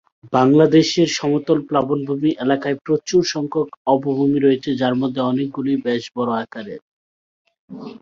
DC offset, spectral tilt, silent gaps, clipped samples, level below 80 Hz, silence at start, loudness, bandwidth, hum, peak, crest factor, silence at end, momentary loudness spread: under 0.1%; -6 dB/octave; 3.77-3.85 s, 6.82-7.45 s, 7.59-7.68 s; under 0.1%; -60 dBFS; 0.25 s; -18 LUFS; 7.6 kHz; none; 0 dBFS; 18 dB; 0.05 s; 9 LU